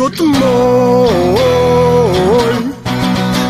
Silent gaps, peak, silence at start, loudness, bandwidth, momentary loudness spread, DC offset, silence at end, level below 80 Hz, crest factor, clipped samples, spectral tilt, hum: none; -2 dBFS; 0 s; -11 LUFS; 15.5 kHz; 5 LU; 0.3%; 0 s; -34 dBFS; 10 dB; under 0.1%; -6 dB/octave; none